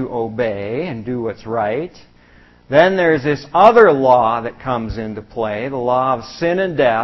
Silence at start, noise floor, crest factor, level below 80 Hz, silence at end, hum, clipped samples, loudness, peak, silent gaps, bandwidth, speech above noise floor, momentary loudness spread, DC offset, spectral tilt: 0 s; -47 dBFS; 16 dB; -44 dBFS; 0 s; none; under 0.1%; -16 LUFS; 0 dBFS; none; 6.6 kHz; 32 dB; 13 LU; under 0.1%; -7 dB/octave